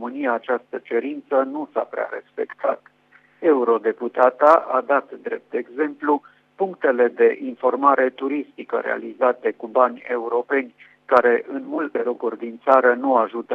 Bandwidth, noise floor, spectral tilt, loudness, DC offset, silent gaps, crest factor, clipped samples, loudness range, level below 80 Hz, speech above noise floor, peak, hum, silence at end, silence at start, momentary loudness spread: 5.6 kHz; -56 dBFS; -6.5 dB/octave; -21 LUFS; under 0.1%; none; 20 dB; under 0.1%; 3 LU; -76 dBFS; 35 dB; -2 dBFS; 50 Hz at -70 dBFS; 0 s; 0 s; 11 LU